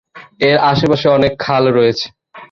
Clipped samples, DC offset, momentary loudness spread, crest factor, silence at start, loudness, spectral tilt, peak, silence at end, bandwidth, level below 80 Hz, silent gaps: under 0.1%; under 0.1%; 6 LU; 14 dB; 0.15 s; -13 LUFS; -6.5 dB/octave; 0 dBFS; 0.05 s; 7.4 kHz; -44 dBFS; none